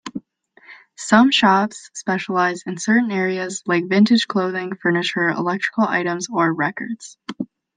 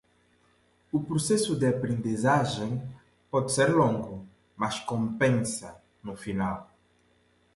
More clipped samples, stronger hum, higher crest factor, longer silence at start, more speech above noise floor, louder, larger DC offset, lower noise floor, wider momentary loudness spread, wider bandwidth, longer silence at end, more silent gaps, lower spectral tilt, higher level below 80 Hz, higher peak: neither; neither; about the same, 18 dB vs 18 dB; second, 0.05 s vs 0.95 s; second, 34 dB vs 39 dB; first, -19 LUFS vs -28 LUFS; neither; second, -53 dBFS vs -66 dBFS; about the same, 16 LU vs 16 LU; second, 9.6 kHz vs 11.5 kHz; second, 0.3 s vs 0.9 s; neither; about the same, -4.5 dB/octave vs -5.5 dB/octave; second, -66 dBFS vs -58 dBFS; first, -2 dBFS vs -10 dBFS